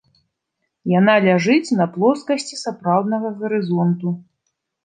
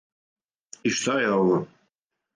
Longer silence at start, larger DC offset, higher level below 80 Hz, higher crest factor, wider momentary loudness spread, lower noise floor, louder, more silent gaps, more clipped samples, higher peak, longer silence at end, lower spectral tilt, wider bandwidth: about the same, 0.85 s vs 0.85 s; neither; about the same, -68 dBFS vs -68 dBFS; about the same, 18 dB vs 16 dB; first, 11 LU vs 8 LU; about the same, -76 dBFS vs -79 dBFS; first, -18 LUFS vs -24 LUFS; neither; neither; first, -2 dBFS vs -10 dBFS; about the same, 0.65 s vs 0.7 s; first, -6.5 dB/octave vs -4.5 dB/octave; about the same, 9.6 kHz vs 10 kHz